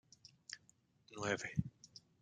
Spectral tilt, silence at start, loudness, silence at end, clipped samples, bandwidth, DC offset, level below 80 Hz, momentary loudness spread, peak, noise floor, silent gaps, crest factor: -4.5 dB/octave; 0.5 s; -44 LUFS; 0.2 s; under 0.1%; 9.6 kHz; under 0.1%; -68 dBFS; 20 LU; -20 dBFS; -73 dBFS; none; 26 dB